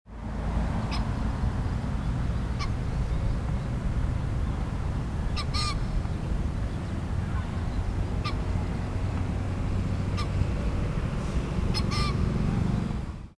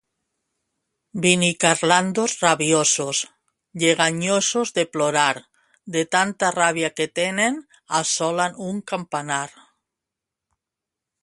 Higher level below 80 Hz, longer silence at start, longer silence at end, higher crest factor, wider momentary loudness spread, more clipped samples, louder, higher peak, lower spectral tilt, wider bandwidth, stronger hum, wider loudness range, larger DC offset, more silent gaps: first, -32 dBFS vs -66 dBFS; second, 0.05 s vs 1.15 s; second, 0.05 s vs 1.75 s; second, 14 dB vs 22 dB; second, 4 LU vs 10 LU; neither; second, -30 LUFS vs -20 LUFS; second, -14 dBFS vs 0 dBFS; first, -6.5 dB/octave vs -2.5 dB/octave; about the same, 11 kHz vs 11.5 kHz; neither; second, 2 LU vs 6 LU; neither; neither